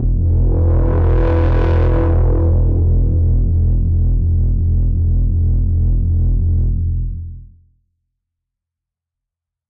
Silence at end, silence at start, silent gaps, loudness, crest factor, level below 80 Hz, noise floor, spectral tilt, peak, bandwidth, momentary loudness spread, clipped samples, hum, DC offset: 2.25 s; 0 s; none; -16 LUFS; 8 dB; -16 dBFS; -84 dBFS; -11.5 dB/octave; -6 dBFS; 3.2 kHz; 3 LU; under 0.1%; none; under 0.1%